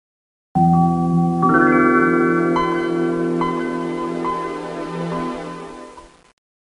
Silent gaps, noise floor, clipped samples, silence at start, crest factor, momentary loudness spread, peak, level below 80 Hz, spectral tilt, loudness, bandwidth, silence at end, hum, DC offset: none; -41 dBFS; under 0.1%; 0.55 s; 16 dB; 13 LU; -2 dBFS; -48 dBFS; -8 dB/octave; -18 LUFS; 10.5 kHz; 0.65 s; none; under 0.1%